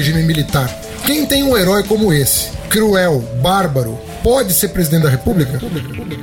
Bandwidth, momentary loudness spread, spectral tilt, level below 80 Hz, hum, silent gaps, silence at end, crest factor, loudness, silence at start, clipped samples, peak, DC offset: 17.5 kHz; 8 LU; -4.5 dB/octave; -32 dBFS; none; none; 0 s; 14 dB; -14 LUFS; 0 s; under 0.1%; 0 dBFS; 0.2%